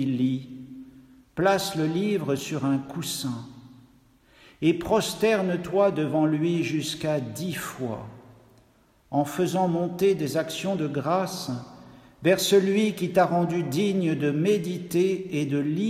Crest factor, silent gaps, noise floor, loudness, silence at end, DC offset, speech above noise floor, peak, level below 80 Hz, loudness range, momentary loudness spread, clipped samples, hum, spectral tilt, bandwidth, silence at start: 18 dB; none; -61 dBFS; -25 LUFS; 0 s; under 0.1%; 36 dB; -8 dBFS; -60 dBFS; 5 LU; 11 LU; under 0.1%; none; -5.5 dB/octave; 16 kHz; 0 s